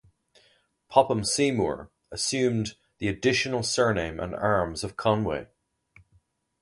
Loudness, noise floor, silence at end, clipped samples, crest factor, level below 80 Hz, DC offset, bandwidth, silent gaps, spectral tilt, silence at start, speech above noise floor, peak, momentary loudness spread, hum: -26 LUFS; -66 dBFS; 1.15 s; under 0.1%; 24 dB; -52 dBFS; under 0.1%; 11.5 kHz; none; -4 dB/octave; 0.9 s; 40 dB; -4 dBFS; 9 LU; none